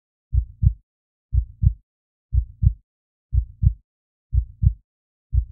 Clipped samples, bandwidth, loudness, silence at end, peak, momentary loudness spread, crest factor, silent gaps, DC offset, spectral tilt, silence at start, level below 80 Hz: under 0.1%; 0.4 kHz; -25 LUFS; 0.05 s; -2 dBFS; 18 LU; 20 dB; 0.83-1.29 s, 1.83-2.29 s, 2.83-3.29 s, 3.84-4.30 s, 4.84-5.30 s; under 0.1%; -19 dB/octave; 0.3 s; -26 dBFS